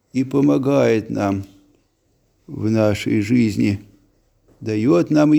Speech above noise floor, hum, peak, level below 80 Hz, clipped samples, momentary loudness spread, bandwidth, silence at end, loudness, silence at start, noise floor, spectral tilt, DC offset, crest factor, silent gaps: 46 dB; none; -4 dBFS; -54 dBFS; under 0.1%; 11 LU; 13.5 kHz; 0 s; -18 LUFS; 0.15 s; -63 dBFS; -7.5 dB/octave; under 0.1%; 16 dB; none